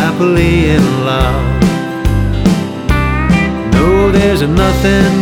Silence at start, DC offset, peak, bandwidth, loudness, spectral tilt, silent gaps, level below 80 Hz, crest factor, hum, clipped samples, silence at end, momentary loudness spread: 0 s; under 0.1%; 0 dBFS; 17 kHz; -11 LUFS; -6.5 dB/octave; none; -18 dBFS; 10 dB; none; under 0.1%; 0 s; 5 LU